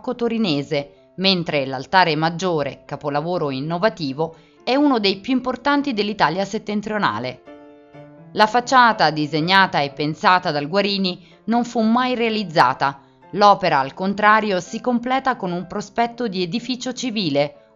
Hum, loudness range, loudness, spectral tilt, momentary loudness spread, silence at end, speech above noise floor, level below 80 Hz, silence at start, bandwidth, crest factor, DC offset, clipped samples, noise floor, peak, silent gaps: none; 4 LU; -19 LUFS; -3 dB/octave; 10 LU; 0.25 s; 24 dB; -58 dBFS; 0.05 s; 7.8 kHz; 20 dB; under 0.1%; under 0.1%; -43 dBFS; 0 dBFS; none